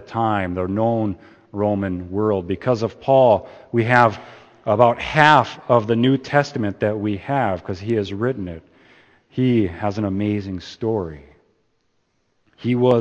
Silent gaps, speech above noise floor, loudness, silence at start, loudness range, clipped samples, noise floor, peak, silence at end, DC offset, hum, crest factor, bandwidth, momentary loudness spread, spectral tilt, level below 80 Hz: none; 48 dB; -20 LUFS; 0 s; 7 LU; under 0.1%; -67 dBFS; 0 dBFS; 0 s; under 0.1%; none; 20 dB; 8.6 kHz; 12 LU; -7 dB/octave; -52 dBFS